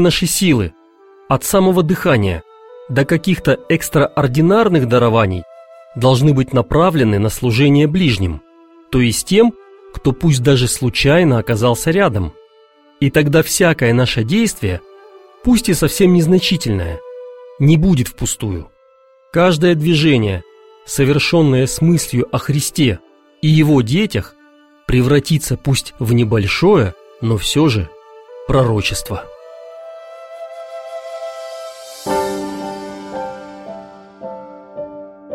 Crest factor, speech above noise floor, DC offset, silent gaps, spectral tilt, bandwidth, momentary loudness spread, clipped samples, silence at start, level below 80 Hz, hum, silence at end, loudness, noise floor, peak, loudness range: 14 dB; 37 dB; under 0.1%; none; -5.5 dB/octave; 16.5 kHz; 19 LU; under 0.1%; 0 s; -36 dBFS; none; 0 s; -14 LUFS; -50 dBFS; 0 dBFS; 11 LU